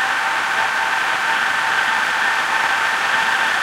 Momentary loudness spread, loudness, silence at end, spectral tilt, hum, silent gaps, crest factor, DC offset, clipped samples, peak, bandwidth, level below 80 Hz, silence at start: 1 LU; -17 LUFS; 0 s; 0 dB/octave; none; none; 16 dB; under 0.1%; under 0.1%; -2 dBFS; 16 kHz; -60 dBFS; 0 s